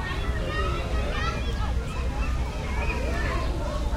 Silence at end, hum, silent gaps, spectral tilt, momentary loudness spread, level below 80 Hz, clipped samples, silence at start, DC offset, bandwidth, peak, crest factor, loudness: 0 s; none; none; -5.5 dB/octave; 2 LU; -28 dBFS; under 0.1%; 0 s; under 0.1%; 12.5 kHz; -14 dBFS; 12 dB; -29 LUFS